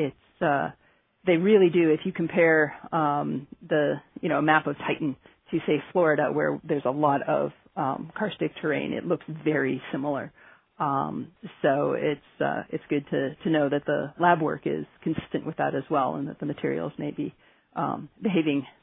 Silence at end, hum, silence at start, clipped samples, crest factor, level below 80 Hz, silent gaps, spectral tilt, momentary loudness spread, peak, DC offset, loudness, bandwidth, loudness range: 0.15 s; none; 0 s; under 0.1%; 22 dB; -66 dBFS; none; -10.5 dB/octave; 10 LU; -4 dBFS; under 0.1%; -26 LUFS; 3.9 kHz; 6 LU